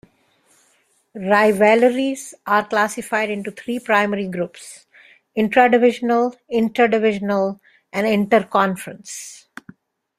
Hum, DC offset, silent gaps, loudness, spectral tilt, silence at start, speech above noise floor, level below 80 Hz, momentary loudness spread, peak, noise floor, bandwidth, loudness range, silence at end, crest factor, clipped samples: none; under 0.1%; none; -18 LUFS; -5 dB/octave; 1.15 s; 43 dB; -64 dBFS; 18 LU; -2 dBFS; -61 dBFS; 15 kHz; 4 LU; 0.85 s; 18 dB; under 0.1%